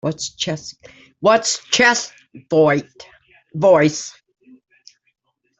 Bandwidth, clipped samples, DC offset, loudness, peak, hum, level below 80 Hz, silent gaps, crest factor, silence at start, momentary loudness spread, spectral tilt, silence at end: 8.4 kHz; under 0.1%; under 0.1%; -17 LUFS; -2 dBFS; none; -62 dBFS; none; 18 dB; 0.05 s; 18 LU; -3.5 dB/octave; 1.5 s